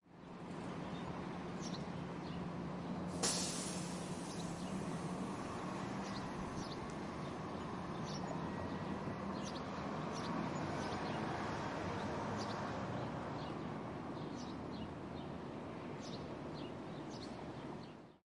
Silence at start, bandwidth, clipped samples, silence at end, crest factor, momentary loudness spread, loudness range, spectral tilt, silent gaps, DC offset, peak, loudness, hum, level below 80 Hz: 0.05 s; 11.5 kHz; under 0.1%; 0.1 s; 22 dB; 6 LU; 5 LU; -4.5 dB/octave; none; under 0.1%; -22 dBFS; -44 LUFS; none; -64 dBFS